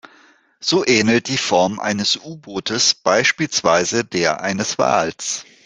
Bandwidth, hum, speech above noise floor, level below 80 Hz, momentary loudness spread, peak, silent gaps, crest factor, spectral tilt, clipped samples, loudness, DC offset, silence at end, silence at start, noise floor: 10 kHz; none; 34 dB; -58 dBFS; 9 LU; 0 dBFS; none; 18 dB; -3 dB/octave; under 0.1%; -17 LUFS; under 0.1%; 0.25 s; 0.6 s; -52 dBFS